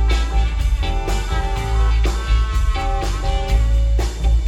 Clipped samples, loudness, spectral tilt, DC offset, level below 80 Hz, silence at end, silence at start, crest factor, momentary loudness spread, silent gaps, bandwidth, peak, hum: under 0.1%; -20 LUFS; -5.5 dB/octave; under 0.1%; -18 dBFS; 0 s; 0 s; 10 dB; 4 LU; none; 10.5 kHz; -6 dBFS; none